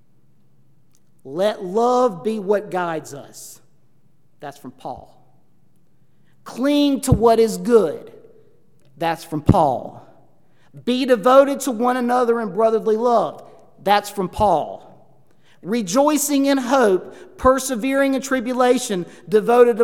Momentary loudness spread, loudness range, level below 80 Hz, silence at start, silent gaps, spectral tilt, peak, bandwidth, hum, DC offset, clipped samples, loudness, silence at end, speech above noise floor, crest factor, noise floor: 20 LU; 10 LU; -44 dBFS; 1.25 s; none; -5 dB/octave; 0 dBFS; 17 kHz; none; 0.3%; under 0.1%; -18 LUFS; 0 s; 43 dB; 20 dB; -61 dBFS